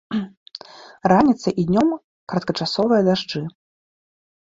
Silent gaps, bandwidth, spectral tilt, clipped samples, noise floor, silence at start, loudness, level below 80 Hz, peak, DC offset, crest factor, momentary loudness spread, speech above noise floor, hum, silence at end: 0.37-0.46 s, 2.04-2.27 s; 7.8 kHz; -6.5 dB/octave; under 0.1%; -41 dBFS; 0.1 s; -20 LUFS; -54 dBFS; -2 dBFS; under 0.1%; 20 dB; 19 LU; 22 dB; none; 1.1 s